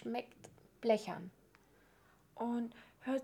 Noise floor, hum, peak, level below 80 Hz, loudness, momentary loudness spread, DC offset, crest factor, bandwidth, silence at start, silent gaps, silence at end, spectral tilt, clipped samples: -68 dBFS; none; -20 dBFS; -78 dBFS; -40 LUFS; 24 LU; under 0.1%; 22 dB; 18.5 kHz; 0 s; none; 0 s; -6 dB/octave; under 0.1%